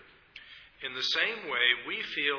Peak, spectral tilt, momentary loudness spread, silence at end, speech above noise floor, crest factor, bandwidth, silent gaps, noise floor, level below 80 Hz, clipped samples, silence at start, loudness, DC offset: -10 dBFS; -1.5 dB/octave; 18 LU; 0 s; 23 dB; 22 dB; 5.4 kHz; none; -53 dBFS; -70 dBFS; under 0.1%; 0.35 s; -28 LUFS; under 0.1%